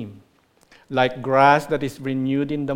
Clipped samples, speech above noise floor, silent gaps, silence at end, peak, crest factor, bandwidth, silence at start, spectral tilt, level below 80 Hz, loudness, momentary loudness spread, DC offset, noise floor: under 0.1%; 39 dB; none; 0 s; 0 dBFS; 20 dB; 16.5 kHz; 0 s; -6.5 dB/octave; -54 dBFS; -20 LUFS; 11 LU; under 0.1%; -58 dBFS